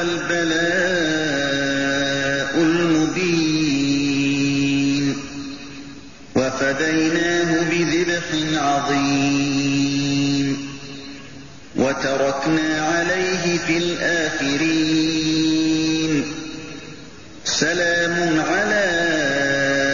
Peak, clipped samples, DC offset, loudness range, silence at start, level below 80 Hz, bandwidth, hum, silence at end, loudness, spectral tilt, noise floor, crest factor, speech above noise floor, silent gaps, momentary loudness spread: -4 dBFS; under 0.1%; 0.8%; 2 LU; 0 s; -50 dBFS; 7.4 kHz; none; 0 s; -19 LUFS; -3.5 dB/octave; -40 dBFS; 14 dB; 21 dB; none; 14 LU